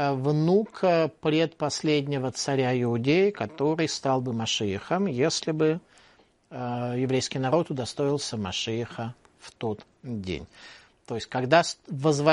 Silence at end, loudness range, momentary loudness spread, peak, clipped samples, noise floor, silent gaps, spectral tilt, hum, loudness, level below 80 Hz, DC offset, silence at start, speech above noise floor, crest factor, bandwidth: 0 s; 6 LU; 12 LU; -4 dBFS; under 0.1%; -60 dBFS; none; -5 dB/octave; none; -26 LUFS; -62 dBFS; under 0.1%; 0 s; 34 dB; 22 dB; 11.5 kHz